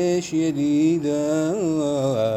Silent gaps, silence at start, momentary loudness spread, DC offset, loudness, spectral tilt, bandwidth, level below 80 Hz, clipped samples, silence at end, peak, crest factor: none; 0 s; 3 LU; under 0.1%; -21 LUFS; -6.5 dB/octave; 12.5 kHz; -58 dBFS; under 0.1%; 0 s; -10 dBFS; 12 dB